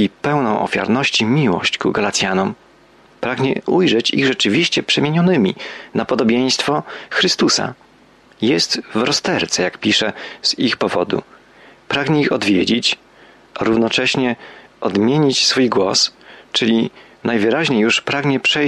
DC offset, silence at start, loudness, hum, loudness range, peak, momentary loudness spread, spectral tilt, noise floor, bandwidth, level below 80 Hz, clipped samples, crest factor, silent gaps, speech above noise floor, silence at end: under 0.1%; 0 s; -16 LUFS; none; 2 LU; -2 dBFS; 8 LU; -4 dB/octave; -49 dBFS; 12 kHz; -56 dBFS; under 0.1%; 14 dB; none; 32 dB; 0 s